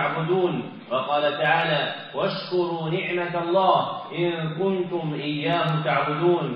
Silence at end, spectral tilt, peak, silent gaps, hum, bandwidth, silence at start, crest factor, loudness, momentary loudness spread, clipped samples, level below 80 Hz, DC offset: 0 s; -4 dB/octave; -6 dBFS; none; none; 5.6 kHz; 0 s; 18 dB; -24 LUFS; 7 LU; under 0.1%; -74 dBFS; under 0.1%